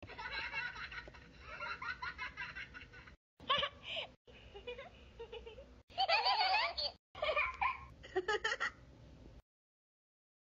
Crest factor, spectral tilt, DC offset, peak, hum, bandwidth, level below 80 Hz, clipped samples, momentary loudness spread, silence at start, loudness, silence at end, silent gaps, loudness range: 22 dB; 0.5 dB/octave; under 0.1%; -20 dBFS; none; 7.6 kHz; -62 dBFS; under 0.1%; 23 LU; 0 s; -38 LUFS; 1.05 s; 3.17-3.37 s, 4.17-4.25 s, 5.83-5.88 s, 6.99-7.15 s; 8 LU